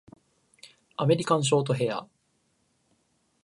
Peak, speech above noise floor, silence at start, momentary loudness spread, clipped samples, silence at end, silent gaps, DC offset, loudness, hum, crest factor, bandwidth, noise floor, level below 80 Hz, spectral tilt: -10 dBFS; 47 dB; 1 s; 11 LU; under 0.1%; 1.4 s; none; under 0.1%; -26 LUFS; none; 20 dB; 11.5 kHz; -71 dBFS; -72 dBFS; -5.5 dB/octave